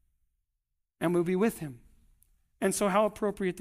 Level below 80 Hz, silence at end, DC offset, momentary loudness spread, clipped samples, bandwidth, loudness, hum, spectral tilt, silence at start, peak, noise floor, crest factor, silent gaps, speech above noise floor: -60 dBFS; 0 s; under 0.1%; 8 LU; under 0.1%; 15.5 kHz; -29 LUFS; none; -5.5 dB/octave; 1 s; -14 dBFS; -82 dBFS; 18 dB; none; 54 dB